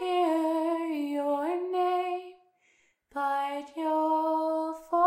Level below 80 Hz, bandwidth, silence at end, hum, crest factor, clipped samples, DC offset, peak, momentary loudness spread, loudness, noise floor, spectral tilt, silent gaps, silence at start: -78 dBFS; 16 kHz; 0 s; none; 18 dB; under 0.1%; under 0.1%; -12 dBFS; 8 LU; -29 LUFS; -68 dBFS; -3.5 dB/octave; none; 0 s